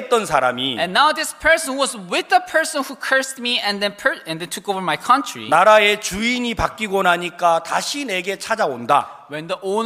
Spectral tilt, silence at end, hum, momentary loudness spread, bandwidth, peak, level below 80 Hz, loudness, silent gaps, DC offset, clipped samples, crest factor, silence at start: -2.5 dB/octave; 0 s; none; 8 LU; 15.5 kHz; 0 dBFS; -46 dBFS; -18 LUFS; none; under 0.1%; under 0.1%; 18 dB; 0 s